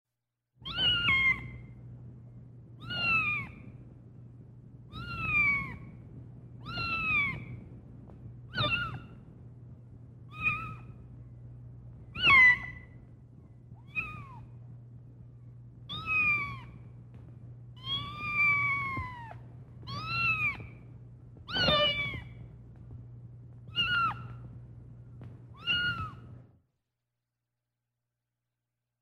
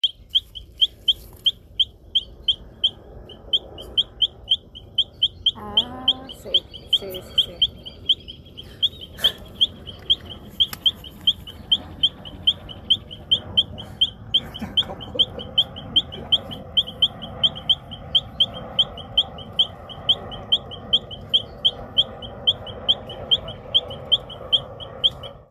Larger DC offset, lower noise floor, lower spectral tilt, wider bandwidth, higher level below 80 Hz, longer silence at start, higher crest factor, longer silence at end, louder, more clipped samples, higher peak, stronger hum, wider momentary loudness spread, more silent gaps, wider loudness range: neither; first, -87 dBFS vs -41 dBFS; about the same, -4.5 dB/octave vs -3.5 dB/octave; about the same, 13.5 kHz vs 14 kHz; second, -54 dBFS vs -46 dBFS; first, 0.6 s vs 0.05 s; about the same, 22 dB vs 18 dB; first, 2.6 s vs 0.2 s; second, -28 LUFS vs -21 LUFS; neither; second, -12 dBFS vs -6 dBFS; first, 60 Hz at -55 dBFS vs none; first, 25 LU vs 4 LU; neither; first, 11 LU vs 2 LU